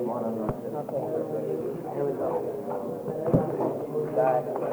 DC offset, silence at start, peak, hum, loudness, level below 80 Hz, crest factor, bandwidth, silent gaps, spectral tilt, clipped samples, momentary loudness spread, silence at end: under 0.1%; 0 s; -8 dBFS; none; -29 LUFS; -56 dBFS; 20 dB; over 20 kHz; none; -9 dB/octave; under 0.1%; 7 LU; 0 s